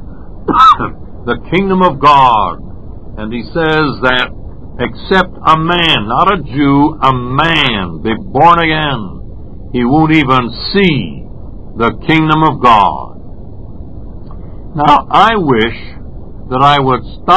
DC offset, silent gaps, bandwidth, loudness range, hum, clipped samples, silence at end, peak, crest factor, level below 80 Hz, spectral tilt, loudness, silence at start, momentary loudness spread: 4%; none; 8 kHz; 3 LU; none; 0.8%; 0 s; 0 dBFS; 12 dB; -30 dBFS; -6.5 dB/octave; -10 LUFS; 0 s; 24 LU